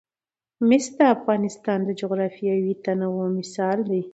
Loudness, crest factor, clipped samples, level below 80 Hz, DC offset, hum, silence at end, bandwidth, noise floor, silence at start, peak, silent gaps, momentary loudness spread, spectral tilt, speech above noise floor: -23 LUFS; 18 dB; under 0.1%; -72 dBFS; under 0.1%; none; 0.05 s; 8.2 kHz; under -90 dBFS; 0.6 s; -6 dBFS; none; 7 LU; -6.5 dB/octave; over 68 dB